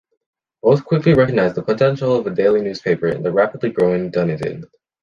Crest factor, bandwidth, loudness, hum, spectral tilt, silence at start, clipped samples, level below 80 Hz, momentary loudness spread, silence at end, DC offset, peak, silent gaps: 16 dB; 7.2 kHz; -17 LUFS; none; -8.5 dB/octave; 0.65 s; under 0.1%; -50 dBFS; 6 LU; 0.35 s; under 0.1%; -2 dBFS; none